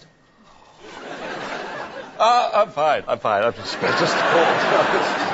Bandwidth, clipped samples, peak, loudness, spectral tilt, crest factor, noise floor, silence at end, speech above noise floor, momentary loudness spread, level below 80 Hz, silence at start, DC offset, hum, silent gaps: 8 kHz; under 0.1%; -4 dBFS; -19 LUFS; -3.5 dB/octave; 16 dB; -52 dBFS; 0 s; 33 dB; 16 LU; -58 dBFS; 0.8 s; under 0.1%; none; none